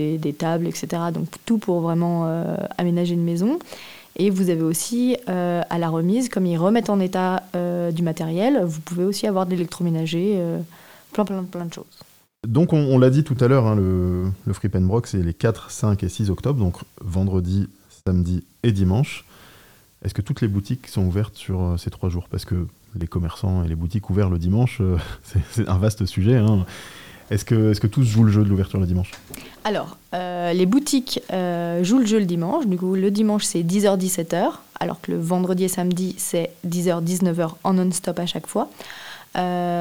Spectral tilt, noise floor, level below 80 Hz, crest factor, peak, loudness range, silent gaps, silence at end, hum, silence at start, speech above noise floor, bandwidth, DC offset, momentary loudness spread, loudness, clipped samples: -6.5 dB/octave; -51 dBFS; -46 dBFS; 16 dB; -4 dBFS; 5 LU; none; 0 s; none; 0 s; 30 dB; 17 kHz; 0.2%; 10 LU; -22 LUFS; under 0.1%